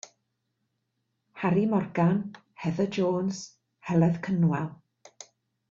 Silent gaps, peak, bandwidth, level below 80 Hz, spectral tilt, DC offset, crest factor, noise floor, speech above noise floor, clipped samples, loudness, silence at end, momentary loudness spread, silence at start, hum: none; -10 dBFS; 7.6 kHz; -66 dBFS; -7.5 dB/octave; under 0.1%; 18 dB; -79 dBFS; 53 dB; under 0.1%; -27 LUFS; 0.5 s; 19 LU; 1.35 s; none